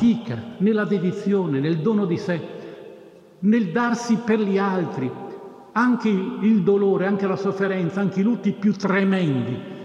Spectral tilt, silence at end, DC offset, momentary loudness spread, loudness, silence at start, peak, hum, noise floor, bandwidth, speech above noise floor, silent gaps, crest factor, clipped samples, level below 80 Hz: -7.5 dB/octave; 0 s; under 0.1%; 10 LU; -22 LUFS; 0 s; -8 dBFS; none; -46 dBFS; 7.8 kHz; 25 dB; none; 14 dB; under 0.1%; -66 dBFS